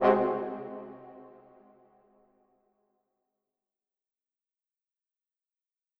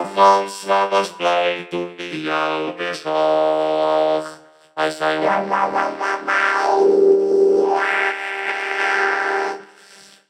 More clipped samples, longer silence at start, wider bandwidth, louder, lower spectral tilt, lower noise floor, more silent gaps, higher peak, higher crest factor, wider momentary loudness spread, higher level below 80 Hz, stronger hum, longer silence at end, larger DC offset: neither; about the same, 0 s vs 0 s; second, 5.8 kHz vs 12 kHz; second, -31 LUFS vs -18 LUFS; first, -8.5 dB/octave vs -3.5 dB/octave; first, -90 dBFS vs -46 dBFS; neither; second, -10 dBFS vs -2 dBFS; first, 26 dB vs 16 dB; first, 26 LU vs 11 LU; about the same, -72 dBFS vs -70 dBFS; neither; first, 4.7 s vs 0.65 s; neither